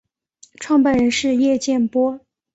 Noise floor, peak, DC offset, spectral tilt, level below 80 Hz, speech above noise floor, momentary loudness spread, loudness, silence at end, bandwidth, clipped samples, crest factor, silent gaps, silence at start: -53 dBFS; -6 dBFS; under 0.1%; -4 dB/octave; -52 dBFS; 36 dB; 9 LU; -18 LUFS; 0.35 s; 8.2 kHz; under 0.1%; 14 dB; none; 0.6 s